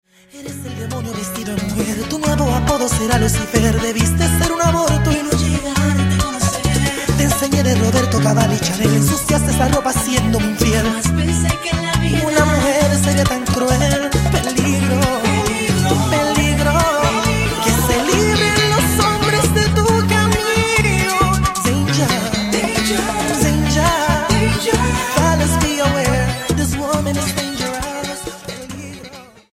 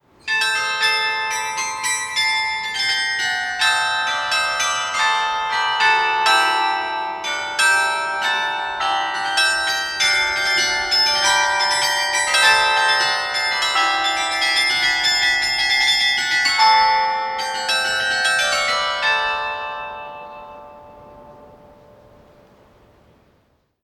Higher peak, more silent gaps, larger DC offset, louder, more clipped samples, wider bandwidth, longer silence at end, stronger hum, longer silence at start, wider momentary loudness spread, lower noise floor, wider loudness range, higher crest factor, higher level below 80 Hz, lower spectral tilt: about the same, 0 dBFS vs -2 dBFS; neither; neither; about the same, -16 LUFS vs -17 LUFS; neither; about the same, 16 kHz vs 17 kHz; second, 0.3 s vs 2.3 s; neither; about the same, 0.35 s vs 0.25 s; about the same, 7 LU vs 8 LU; second, -37 dBFS vs -62 dBFS; about the same, 3 LU vs 4 LU; about the same, 16 dB vs 18 dB; first, -28 dBFS vs -54 dBFS; first, -4.5 dB/octave vs 1 dB/octave